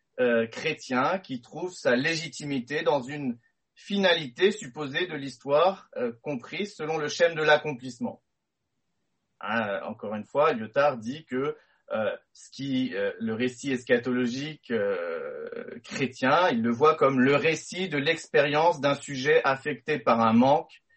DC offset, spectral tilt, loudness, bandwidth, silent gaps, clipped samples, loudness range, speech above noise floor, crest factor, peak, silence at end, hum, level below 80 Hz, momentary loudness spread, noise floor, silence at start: under 0.1%; -5 dB/octave; -26 LUFS; 8.4 kHz; none; under 0.1%; 6 LU; 56 dB; 18 dB; -8 dBFS; 0.35 s; none; -70 dBFS; 13 LU; -82 dBFS; 0.15 s